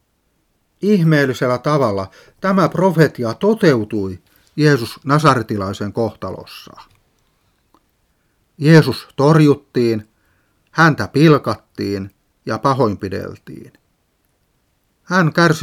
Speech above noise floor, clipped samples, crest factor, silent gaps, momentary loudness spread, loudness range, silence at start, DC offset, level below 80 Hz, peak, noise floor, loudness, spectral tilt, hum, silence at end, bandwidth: 49 dB; under 0.1%; 18 dB; none; 17 LU; 7 LU; 0.8 s; under 0.1%; -56 dBFS; 0 dBFS; -64 dBFS; -16 LUFS; -7 dB/octave; none; 0 s; 15 kHz